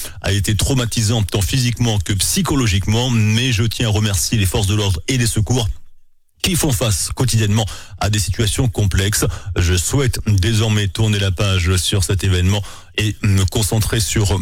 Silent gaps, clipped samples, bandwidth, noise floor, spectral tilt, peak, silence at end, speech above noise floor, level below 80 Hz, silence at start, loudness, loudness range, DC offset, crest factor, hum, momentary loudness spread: none; under 0.1%; 17 kHz; -45 dBFS; -4.5 dB/octave; -6 dBFS; 0 s; 29 dB; -30 dBFS; 0 s; -17 LUFS; 2 LU; under 0.1%; 10 dB; none; 4 LU